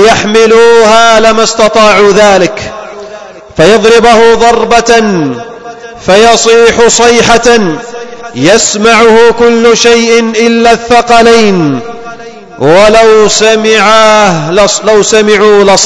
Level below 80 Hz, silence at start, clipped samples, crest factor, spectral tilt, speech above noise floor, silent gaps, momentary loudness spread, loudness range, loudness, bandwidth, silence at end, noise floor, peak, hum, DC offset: -32 dBFS; 0 s; 20%; 4 dB; -3 dB/octave; 22 dB; none; 17 LU; 2 LU; -4 LUFS; 11 kHz; 0 s; -26 dBFS; 0 dBFS; none; under 0.1%